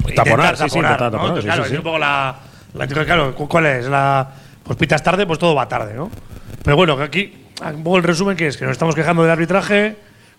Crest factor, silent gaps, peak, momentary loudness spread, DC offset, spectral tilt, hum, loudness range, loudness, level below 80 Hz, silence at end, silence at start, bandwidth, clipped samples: 16 dB; none; 0 dBFS; 13 LU; under 0.1%; -5.5 dB/octave; none; 1 LU; -16 LUFS; -38 dBFS; 0.45 s; 0 s; 15.5 kHz; under 0.1%